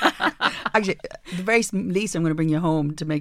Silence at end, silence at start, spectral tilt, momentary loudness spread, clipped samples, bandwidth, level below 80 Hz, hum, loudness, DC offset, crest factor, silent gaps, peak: 0 s; 0 s; -5 dB/octave; 7 LU; under 0.1%; 15.5 kHz; -52 dBFS; none; -23 LUFS; under 0.1%; 18 dB; none; -4 dBFS